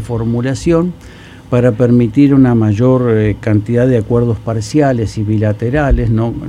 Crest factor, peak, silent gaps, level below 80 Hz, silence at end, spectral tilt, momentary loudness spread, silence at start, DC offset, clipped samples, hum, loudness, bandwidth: 12 dB; 0 dBFS; none; -26 dBFS; 0 s; -8.5 dB/octave; 7 LU; 0 s; under 0.1%; under 0.1%; none; -13 LUFS; 11 kHz